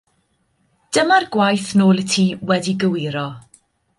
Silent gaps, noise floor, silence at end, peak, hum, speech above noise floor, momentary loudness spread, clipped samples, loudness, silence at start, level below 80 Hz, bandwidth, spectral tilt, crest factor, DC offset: none; -65 dBFS; 0.6 s; -2 dBFS; none; 48 dB; 9 LU; under 0.1%; -17 LUFS; 0.9 s; -60 dBFS; 11.5 kHz; -5 dB/octave; 16 dB; under 0.1%